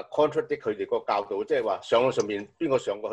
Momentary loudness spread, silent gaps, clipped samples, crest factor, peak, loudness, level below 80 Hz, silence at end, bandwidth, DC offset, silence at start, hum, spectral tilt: 6 LU; none; under 0.1%; 16 dB; -10 dBFS; -27 LUFS; -66 dBFS; 0 s; 8.8 kHz; under 0.1%; 0 s; none; -5 dB/octave